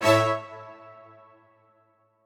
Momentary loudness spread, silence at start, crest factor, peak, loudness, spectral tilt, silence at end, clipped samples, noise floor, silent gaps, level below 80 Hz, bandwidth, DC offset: 27 LU; 0 s; 20 dB; -8 dBFS; -24 LUFS; -5 dB/octave; 1.55 s; under 0.1%; -65 dBFS; none; -72 dBFS; 19.5 kHz; under 0.1%